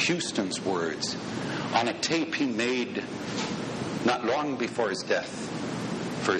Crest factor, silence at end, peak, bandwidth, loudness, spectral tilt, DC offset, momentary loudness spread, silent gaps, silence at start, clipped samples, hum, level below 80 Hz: 18 dB; 0 s; -12 dBFS; 11 kHz; -29 LUFS; -4 dB/octave; under 0.1%; 6 LU; none; 0 s; under 0.1%; none; -64 dBFS